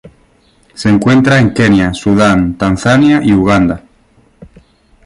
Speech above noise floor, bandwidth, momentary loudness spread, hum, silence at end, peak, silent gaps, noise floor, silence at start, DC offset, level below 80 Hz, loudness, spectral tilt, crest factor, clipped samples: 40 dB; 11.5 kHz; 5 LU; none; 0.6 s; 0 dBFS; none; -49 dBFS; 0.05 s; under 0.1%; -34 dBFS; -10 LUFS; -6.5 dB/octave; 12 dB; under 0.1%